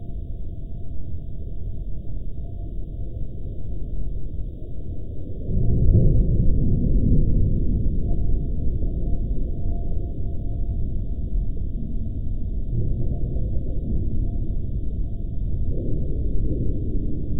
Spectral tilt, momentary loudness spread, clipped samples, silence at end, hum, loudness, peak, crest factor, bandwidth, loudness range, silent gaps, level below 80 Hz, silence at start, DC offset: -14 dB/octave; 14 LU; under 0.1%; 0 s; none; -27 LUFS; -4 dBFS; 18 dB; 0.7 kHz; 12 LU; none; -24 dBFS; 0 s; under 0.1%